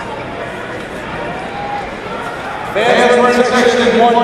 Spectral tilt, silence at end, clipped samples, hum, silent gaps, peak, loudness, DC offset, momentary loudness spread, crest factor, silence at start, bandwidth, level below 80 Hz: -4 dB/octave; 0 s; under 0.1%; none; none; 0 dBFS; -14 LUFS; under 0.1%; 14 LU; 14 dB; 0 s; 14 kHz; -42 dBFS